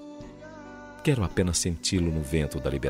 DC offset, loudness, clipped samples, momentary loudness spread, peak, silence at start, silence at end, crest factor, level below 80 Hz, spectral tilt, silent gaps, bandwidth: under 0.1%; -27 LUFS; under 0.1%; 18 LU; -12 dBFS; 0 s; 0 s; 16 dB; -42 dBFS; -5 dB/octave; none; 16 kHz